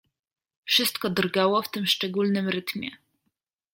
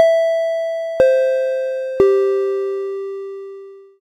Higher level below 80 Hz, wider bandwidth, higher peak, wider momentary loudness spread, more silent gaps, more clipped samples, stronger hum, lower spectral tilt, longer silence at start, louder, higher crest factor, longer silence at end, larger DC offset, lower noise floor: second, -70 dBFS vs -52 dBFS; first, 17 kHz vs 10.5 kHz; second, -8 dBFS vs 0 dBFS; second, 12 LU vs 16 LU; neither; neither; neither; about the same, -4 dB/octave vs -5 dB/octave; first, 0.65 s vs 0 s; second, -24 LUFS vs -18 LUFS; about the same, 20 dB vs 18 dB; first, 0.8 s vs 0.2 s; neither; first, -78 dBFS vs -37 dBFS